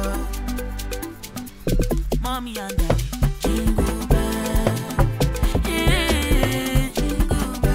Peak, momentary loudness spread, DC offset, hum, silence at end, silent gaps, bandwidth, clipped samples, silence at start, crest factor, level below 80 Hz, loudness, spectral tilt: -2 dBFS; 10 LU; under 0.1%; none; 0 s; none; 16 kHz; under 0.1%; 0 s; 18 dB; -24 dBFS; -23 LUFS; -5 dB/octave